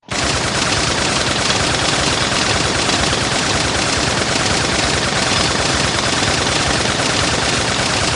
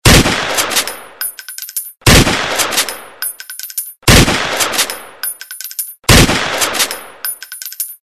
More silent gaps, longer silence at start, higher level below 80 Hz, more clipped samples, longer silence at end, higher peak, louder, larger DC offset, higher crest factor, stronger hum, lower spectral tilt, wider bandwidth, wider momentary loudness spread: neither; about the same, 0.1 s vs 0.05 s; second, -34 dBFS vs -24 dBFS; second, under 0.1% vs 0.3%; about the same, 0 s vs 0.1 s; about the same, 0 dBFS vs 0 dBFS; about the same, -15 LUFS vs -13 LUFS; neither; about the same, 16 dB vs 14 dB; neither; about the same, -2.5 dB/octave vs -3 dB/octave; second, 11.5 kHz vs over 20 kHz; second, 1 LU vs 14 LU